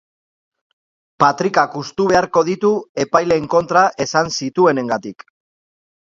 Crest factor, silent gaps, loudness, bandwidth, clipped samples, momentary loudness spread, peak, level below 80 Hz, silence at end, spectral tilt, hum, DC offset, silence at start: 18 dB; 2.89-2.95 s; -16 LUFS; 7.6 kHz; under 0.1%; 6 LU; 0 dBFS; -54 dBFS; 0.9 s; -4.5 dB/octave; none; under 0.1%; 1.2 s